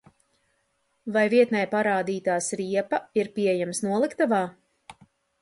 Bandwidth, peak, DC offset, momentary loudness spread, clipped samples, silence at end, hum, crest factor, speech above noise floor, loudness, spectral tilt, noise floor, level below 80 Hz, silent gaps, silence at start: 11.5 kHz; -8 dBFS; under 0.1%; 7 LU; under 0.1%; 0.5 s; none; 18 dB; 48 dB; -25 LUFS; -4.5 dB/octave; -72 dBFS; -72 dBFS; none; 1.05 s